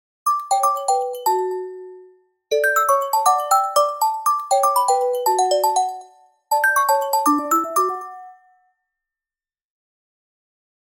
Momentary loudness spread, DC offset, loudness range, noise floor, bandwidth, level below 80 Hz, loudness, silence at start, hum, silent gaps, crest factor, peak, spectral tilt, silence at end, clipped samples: 9 LU; under 0.1%; 6 LU; under -90 dBFS; 17 kHz; -76 dBFS; -19 LUFS; 0.25 s; none; none; 16 dB; -4 dBFS; 0 dB/octave; 2.6 s; under 0.1%